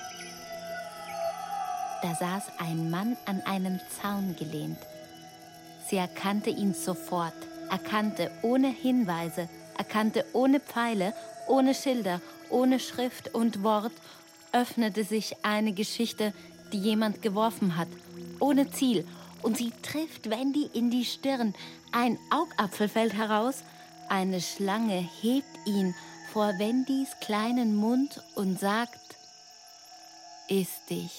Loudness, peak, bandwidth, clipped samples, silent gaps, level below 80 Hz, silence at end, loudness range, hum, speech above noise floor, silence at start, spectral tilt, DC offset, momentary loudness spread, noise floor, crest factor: -30 LUFS; -10 dBFS; 16.5 kHz; under 0.1%; none; -74 dBFS; 0 s; 5 LU; none; 23 dB; 0 s; -5 dB/octave; under 0.1%; 16 LU; -52 dBFS; 20 dB